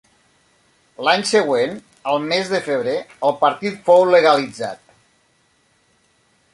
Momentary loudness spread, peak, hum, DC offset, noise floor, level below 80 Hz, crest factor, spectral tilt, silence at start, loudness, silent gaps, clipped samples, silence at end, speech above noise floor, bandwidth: 14 LU; -2 dBFS; none; under 0.1%; -61 dBFS; -66 dBFS; 18 dB; -4 dB/octave; 1 s; -18 LUFS; none; under 0.1%; 1.8 s; 44 dB; 11.5 kHz